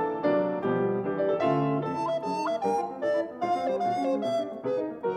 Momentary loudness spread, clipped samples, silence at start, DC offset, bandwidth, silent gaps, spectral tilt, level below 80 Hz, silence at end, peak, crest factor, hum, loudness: 4 LU; under 0.1%; 0 s; under 0.1%; 10.5 kHz; none; -7 dB/octave; -68 dBFS; 0 s; -14 dBFS; 14 dB; none; -28 LUFS